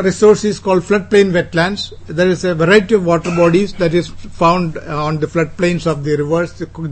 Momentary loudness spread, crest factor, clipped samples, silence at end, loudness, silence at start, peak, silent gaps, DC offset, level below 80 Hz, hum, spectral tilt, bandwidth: 9 LU; 14 dB; under 0.1%; 0 s; -14 LUFS; 0 s; 0 dBFS; none; under 0.1%; -38 dBFS; none; -6 dB/octave; 8.8 kHz